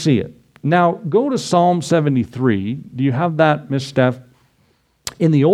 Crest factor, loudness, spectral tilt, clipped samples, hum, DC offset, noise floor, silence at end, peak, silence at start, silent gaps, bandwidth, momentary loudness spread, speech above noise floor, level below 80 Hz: 16 dB; -17 LUFS; -6.5 dB/octave; under 0.1%; none; under 0.1%; -60 dBFS; 0 s; -2 dBFS; 0 s; none; 14 kHz; 11 LU; 44 dB; -56 dBFS